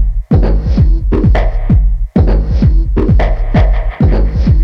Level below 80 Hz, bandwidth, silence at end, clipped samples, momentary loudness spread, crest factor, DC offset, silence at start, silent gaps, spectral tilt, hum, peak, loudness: -10 dBFS; 5.6 kHz; 0 s; under 0.1%; 2 LU; 8 dB; under 0.1%; 0 s; none; -10 dB/octave; none; -2 dBFS; -12 LUFS